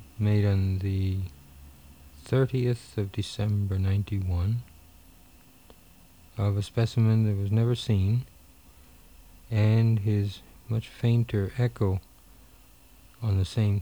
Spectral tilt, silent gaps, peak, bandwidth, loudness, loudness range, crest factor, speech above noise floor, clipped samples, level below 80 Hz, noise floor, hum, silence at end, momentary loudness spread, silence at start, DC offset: -8 dB/octave; none; -12 dBFS; 20 kHz; -27 LUFS; 4 LU; 16 dB; 30 dB; under 0.1%; -50 dBFS; -55 dBFS; none; 0 s; 10 LU; 0 s; under 0.1%